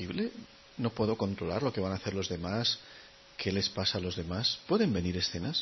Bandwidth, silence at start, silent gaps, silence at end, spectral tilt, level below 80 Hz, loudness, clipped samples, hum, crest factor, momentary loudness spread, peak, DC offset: 6.2 kHz; 0 s; none; 0 s; -5 dB/octave; -56 dBFS; -32 LUFS; under 0.1%; none; 18 dB; 9 LU; -16 dBFS; under 0.1%